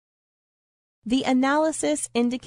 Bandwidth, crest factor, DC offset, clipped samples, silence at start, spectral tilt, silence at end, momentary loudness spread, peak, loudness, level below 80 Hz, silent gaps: 11 kHz; 16 dB; under 0.1%; under 0.1%; 1.05 s; -3 dB/octave; 0 s; 5 LU; -10 dBFS; -23 LUFS; -60 dBFS; none